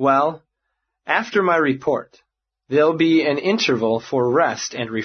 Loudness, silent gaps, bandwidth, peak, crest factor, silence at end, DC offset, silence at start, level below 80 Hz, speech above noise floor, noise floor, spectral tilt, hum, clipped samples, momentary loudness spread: -19 LUFS; none; 6.6 kHz; -2 dBFS; 18 dB; 0 s; under 0.1%; 0 s; -64 dBFS; 58 dB; -77 dBFS; -5 dB/octave; none; under 0.1%; 8 LU